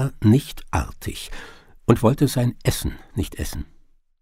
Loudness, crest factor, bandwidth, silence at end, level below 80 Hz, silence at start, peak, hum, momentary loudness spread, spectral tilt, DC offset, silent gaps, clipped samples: -22 LUFS; 22 dB; 16 kHz; 0.55 s; -36 dBFS; 0 s; -2 dBFS; none; 18 LU; -6.5 dB/octave; under 0.1%; none; under 0.1%